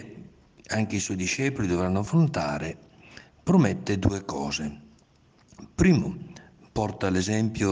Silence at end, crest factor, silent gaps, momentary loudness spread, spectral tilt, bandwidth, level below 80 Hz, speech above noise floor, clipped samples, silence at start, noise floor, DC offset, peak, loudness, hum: 0 s; 18 dB; none; 15 LU; -6 dB/octave; 10 kHz; -48 dBFS; 35 dB; under 0.1%; 0 s; -60 dBFS; under 0.1%; -8 dBFS; -26 LUFS; none